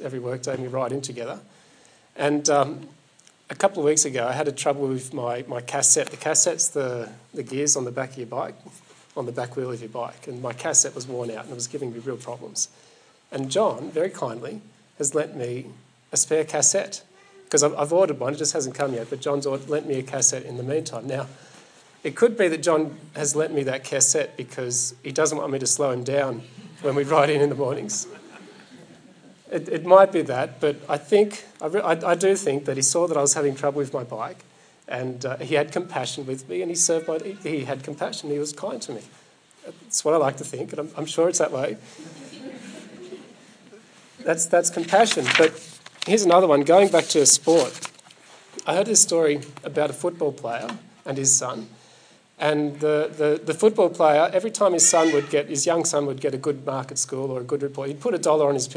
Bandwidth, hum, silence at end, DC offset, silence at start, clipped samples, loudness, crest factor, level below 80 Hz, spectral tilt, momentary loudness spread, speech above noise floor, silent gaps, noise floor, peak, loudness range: 10.5 kHz; none; 0 s; under 0.1%; 0 s; under 0.1%; -22 LUFS; 22 dB; -82 dBFS; -3 dB/octave; 16 LU; 34 dB; none; -56 dBFS; 0 dBFS; 8 LU